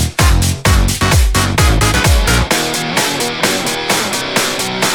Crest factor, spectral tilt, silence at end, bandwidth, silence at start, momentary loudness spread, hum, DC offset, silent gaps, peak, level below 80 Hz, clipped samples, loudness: 12 dB; -3.5 dB/octave; 0 s; 19.5 kHz; 0 s; 3 LU; none; under 0.1%; none; 0 dBFS; -18 dBFS; under 0.1%; -13 LUFS